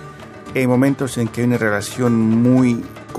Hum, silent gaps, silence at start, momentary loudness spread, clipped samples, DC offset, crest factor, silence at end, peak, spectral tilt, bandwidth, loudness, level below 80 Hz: none; none; 0 s; 11 LU; under 0.1%; under 0.1%; 14 dB; 0 s; -2 dBFS; -6.5 dB/octave; 13.5 kHz; -17 LUFS; -52 dBFS